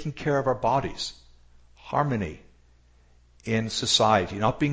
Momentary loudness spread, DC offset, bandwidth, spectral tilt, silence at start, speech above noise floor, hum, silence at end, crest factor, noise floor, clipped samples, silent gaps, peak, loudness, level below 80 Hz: 13 LU; under 0.1%; 8 kHz; -4.5 dB/octave; 0 s; 33 dB; none; 0 s; 20 dB; -57 dBFS; under 0.1%; none; -6 dBFS; -25 LUFS; -50 dBFS